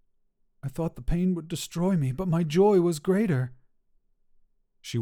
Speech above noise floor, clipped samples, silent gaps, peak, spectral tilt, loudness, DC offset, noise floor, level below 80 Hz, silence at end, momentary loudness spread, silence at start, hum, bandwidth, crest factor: 43 dB; under 0.1%; none; -10 dBFS; -7 dB/octave; -26 LUFS; under 0.1%; -68 dBFS; -44 dBFS; 0 s; 14 LU; 0.65 s; none; 17 kHz; 16 dB